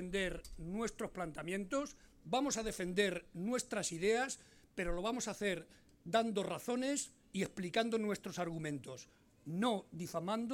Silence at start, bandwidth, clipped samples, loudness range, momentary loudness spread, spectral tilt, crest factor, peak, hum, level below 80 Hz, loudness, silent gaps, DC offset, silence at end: 0 s; 17 kHz; under 0.1%; 2 LU; 10 LU; -4 dB/octave; 20 dB; -20 dBFS; none; -58 dBFS; -39 LUFS; none; under 0.1%; 0 s